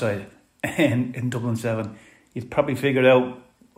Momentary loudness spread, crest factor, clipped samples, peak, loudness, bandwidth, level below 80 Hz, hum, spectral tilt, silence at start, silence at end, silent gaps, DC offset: 15 LU; 20 dB; under 0.1%; -4 dBFS; -23 LUFS; 16 kHz; -60 dBFS; none; -6.5 dB/octave; 0 s; 0.4 s; none; under 0.1%